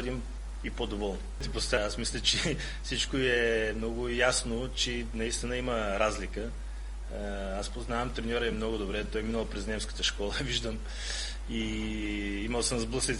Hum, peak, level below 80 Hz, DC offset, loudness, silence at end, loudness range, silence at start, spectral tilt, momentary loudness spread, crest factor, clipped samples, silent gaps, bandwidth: none; -12 dBFS; -38 dBFS; under 0.1%; -32 LUFS; 0 s; 5 LU; 0 s; -3.5 dB/octave; 11 LU; 20 dB; under 0.1%; none; 11.5 kHz